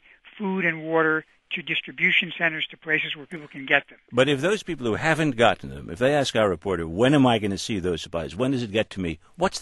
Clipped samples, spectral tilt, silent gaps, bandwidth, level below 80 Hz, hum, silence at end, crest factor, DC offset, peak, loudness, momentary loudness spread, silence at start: under 0.1%; -5 dB/octave; none; 12 kHz; -52 dBFS; none; 0 s; 22 dB; under 0.1%; -2 dBFS; -23 LUFS; 12 LU; 0.25 s